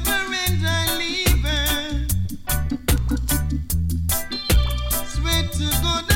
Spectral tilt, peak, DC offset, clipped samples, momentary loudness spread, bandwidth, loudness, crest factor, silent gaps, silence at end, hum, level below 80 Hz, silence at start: -3.5 dB/octave; -4 dBFS; under 0.1%; under 0.1%; 4 LU; 17 kHz; -22 LUFS; 16 dB; none; 0 s; none; -26 dBFS; 0 s